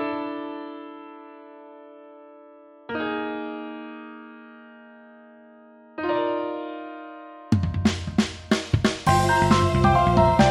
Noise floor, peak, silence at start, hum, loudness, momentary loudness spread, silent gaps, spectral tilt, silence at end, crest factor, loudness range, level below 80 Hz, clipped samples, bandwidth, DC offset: -49 dBFS; -4 dBFS; 0 s; none; -23 LUFS; 25 LU; none; -6 dB/octave; 0 s; 20 dB; 13 LU; -40 dBFS; under 0.1%; 14.5 kHz; under 0.1%